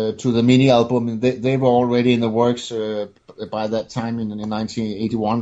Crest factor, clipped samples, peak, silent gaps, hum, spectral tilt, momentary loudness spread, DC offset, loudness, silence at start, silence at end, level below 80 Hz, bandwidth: 18 dB; under 0.1%; -2 dBFS; none; none; -7 dB/octave; 11 LU; under 0.1%; -19 LUFS; 0 s; 0 s; -54 dBFS; 8 kHz